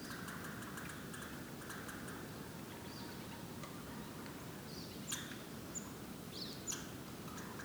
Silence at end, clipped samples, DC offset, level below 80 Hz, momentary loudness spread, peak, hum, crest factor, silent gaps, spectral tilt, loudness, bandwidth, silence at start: 0 s; under 0.1%; under 0.1%; -66 dBFS; 5 LU; -28 dBFS; none; 20 dB; none; -3.5 dB/octave; -47 LUFS; over 20 kHz; 0 s